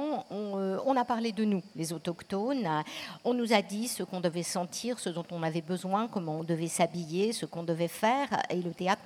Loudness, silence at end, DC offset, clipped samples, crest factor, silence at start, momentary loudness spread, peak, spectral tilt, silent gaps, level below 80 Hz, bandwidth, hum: -32 LUFS; 0 s; under 0.1%; under 0.1%; 20 dB; 0 s; 7 LU; -10 dBFS; -5 dB/octave; none; -76 dBFS; 17.5 kHz; none